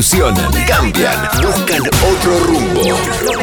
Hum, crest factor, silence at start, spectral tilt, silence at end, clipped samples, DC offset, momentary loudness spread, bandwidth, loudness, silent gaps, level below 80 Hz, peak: none; 10 dB; 0 s; -4 dB/octave; 0 s; under 0.1%; under 0.1%; 2 LU; 20 kHz; -12 LUFS; none; -22 dBFS; -2 dBFS